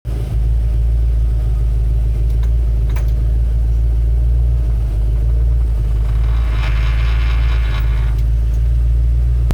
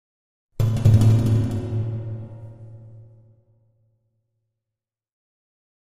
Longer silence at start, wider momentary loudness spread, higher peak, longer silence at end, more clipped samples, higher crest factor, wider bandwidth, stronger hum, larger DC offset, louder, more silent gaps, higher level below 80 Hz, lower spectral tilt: second, 0.05 s vs 0.6 s; second, 2 LU vs 25 LU; about the same, -8 dBFS vs -6 dBFS; second, 0 s vs 2.85 s; neither; second, 6 dB vs 18 dB; second, 5.4 kHz vs 11 kHz; neither; first, 0.8% vs under 0.1%; first, -17 LUFS vs -20 LUFS; neither; first, -14 dBFS vs -40 dBFS; about the same, -7.5 dB/octave vs -8.5 dB/octave